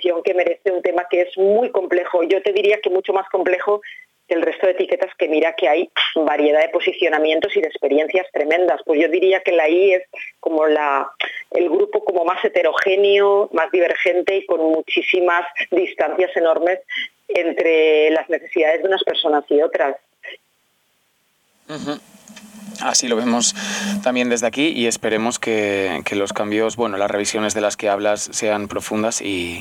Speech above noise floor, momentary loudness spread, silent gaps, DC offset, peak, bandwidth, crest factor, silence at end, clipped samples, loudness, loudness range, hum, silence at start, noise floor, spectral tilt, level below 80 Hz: 46 dB; 7 LU; none; under 0.1%; -4 dBFS; 14.5 kHz; 14 dB; 0 s; under 0.1%; -18 LUFS; 4 LU; none; 0 s; -64 dBFS; -2.5 dB/octave; -64 dBFS